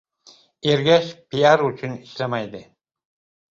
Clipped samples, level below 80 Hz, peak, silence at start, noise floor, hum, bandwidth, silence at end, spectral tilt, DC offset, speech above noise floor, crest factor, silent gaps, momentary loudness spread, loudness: under 0.1%; -62 dBFS; -2 dBFS; 0.65 s; -53 dBFS; none; 7.6 kHz; 0.9 s; -5.5 dB/octave; under 0.1%; 33 dB; 20 dB; none; 15 LU; -20 LUFS